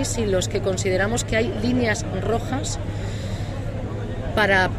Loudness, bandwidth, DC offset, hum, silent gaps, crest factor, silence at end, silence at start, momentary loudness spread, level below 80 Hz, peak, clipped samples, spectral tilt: -23 LUFS; 15 kHz; under 0.1%; none; none; 18 dB; 0 s; 0 s; 8 LU; -34 dBFS; -6 dBFS; under 0.1%; -5 dB/octave